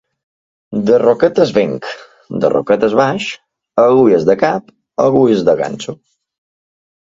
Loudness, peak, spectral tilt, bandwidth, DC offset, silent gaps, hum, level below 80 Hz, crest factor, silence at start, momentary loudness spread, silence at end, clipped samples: -13 LUFS; 0 dBFS; -6.5 dB/octave; 7.8 kHz; under 0.1%; none; none; -54 dBFS; 14 dB; 0.7 s; 15 LU; 1.25 s; under 0.1%